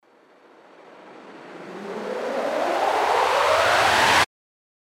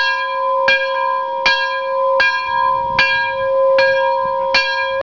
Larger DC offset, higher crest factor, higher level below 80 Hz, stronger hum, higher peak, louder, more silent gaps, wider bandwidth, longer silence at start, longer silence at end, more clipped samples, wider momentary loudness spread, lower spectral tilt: second, under 0.1% vs 0.4%; first, 18 dB vs 10 dB; second, -56 dBFS vs -50 dBFS; neither; about the same, -4 dBFS vs -6 dBFS; second, -20 LUFS vs -15 LUFS; neither; first, 16.5 kHz vs 5.4 kHz; first, 1 s vs 0 s; first, 0.6 s vs 0 s; neither; first, 20 LU vs 5 LU; about the same, -2 dB/octave vs -2 dB/octave